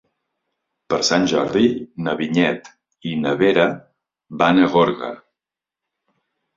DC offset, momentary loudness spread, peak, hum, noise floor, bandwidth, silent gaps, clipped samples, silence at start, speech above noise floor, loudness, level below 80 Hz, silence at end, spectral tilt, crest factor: under 0.1%; 16 LU; -2 dBFS; none; -87 dBFS; 7.6 kHz; none; under 0.1%; 0.9 s; 69 dB; -18 LUFS; -58 dBFS; 1.4 s; -5 dB/octave; 20 dB